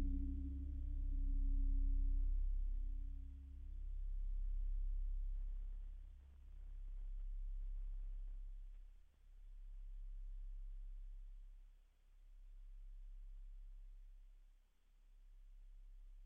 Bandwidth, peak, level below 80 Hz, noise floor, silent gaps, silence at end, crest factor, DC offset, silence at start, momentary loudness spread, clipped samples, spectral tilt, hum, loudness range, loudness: 0.6 kHz; -32 dBFS; -44 dBFS; -70 dBFS; none; 0 s; 12 dB; under 0.1%; 0 s; 21 LU; under 0.1%; -13 dB/octave; none; 18 LU; -50 LUFS